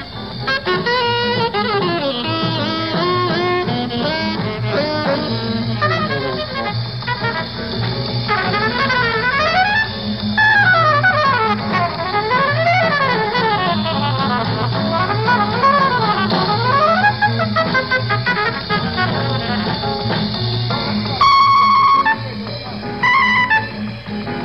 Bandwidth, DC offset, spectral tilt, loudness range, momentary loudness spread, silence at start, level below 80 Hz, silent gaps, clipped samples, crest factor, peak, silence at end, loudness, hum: 6.8 kHz; 0.4%; -6.5 dB/octave; 5 LU; 9 LU; 0 s; -42 dBFS; none; under 0.1%; 14 dB; -2 dBFS; 0 s; -16 LUFS; none